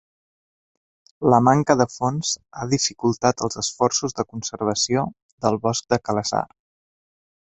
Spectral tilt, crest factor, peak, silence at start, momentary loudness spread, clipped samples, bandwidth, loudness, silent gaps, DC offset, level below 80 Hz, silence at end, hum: -4.5 dB/octave; 22 dB; -2 dBFS; 1.2 s; 10 LU; under 0.1%; 8.4 kHz; -22 LUFS; 5.22-5.38 s; under 0.1%; -56 dBFS; 1.1 s; none